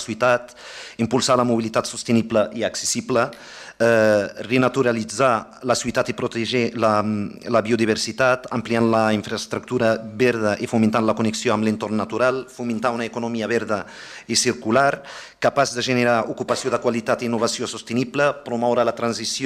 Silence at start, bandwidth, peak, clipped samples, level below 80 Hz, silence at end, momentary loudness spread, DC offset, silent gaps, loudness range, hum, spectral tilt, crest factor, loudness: 0 s; 14.5 kHz; -4 dBFS; under 0.1%; -58 dBFS; 0 s; 8 LU; under 0.1%; none; 2 LU; none; -4.5 dB/octave; 18 dB; -21 LUFS